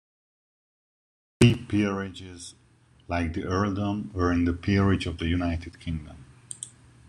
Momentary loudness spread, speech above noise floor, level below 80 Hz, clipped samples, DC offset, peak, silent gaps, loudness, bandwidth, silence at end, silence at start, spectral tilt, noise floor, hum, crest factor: 20 LU; 27 dB; -44 dBFS; under 0.1%; under 0.1%; -2 dBFS; none; -26 LUFS; 11 kHz; 0.4 s; 1.4 s; -6.5 dB/octave; -53 dBFS; none; 26 dB